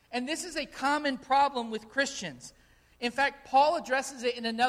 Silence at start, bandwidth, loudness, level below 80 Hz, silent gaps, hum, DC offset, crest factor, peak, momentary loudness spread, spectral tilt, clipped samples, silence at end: 0.1 s; 14.5 kHz; -29 LUFS; -64 dBFS; none; none; under 0.1%; 18 dB; -12 dBFS; 11 LU; -2.5 dB/octave; under 0.1%; 0 s